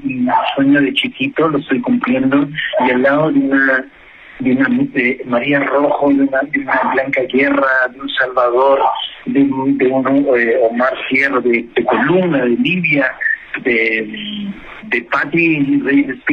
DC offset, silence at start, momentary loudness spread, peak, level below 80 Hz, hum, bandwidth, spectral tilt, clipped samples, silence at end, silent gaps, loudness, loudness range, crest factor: under 0.1%; 0 s; 5 LU; 0 dBFS; -52 dBFS; none; 5.2 kHz; -7.5 dB/octave; under 0.1%; 0 s; none; -14 LUFS; 2 LU; 14 dB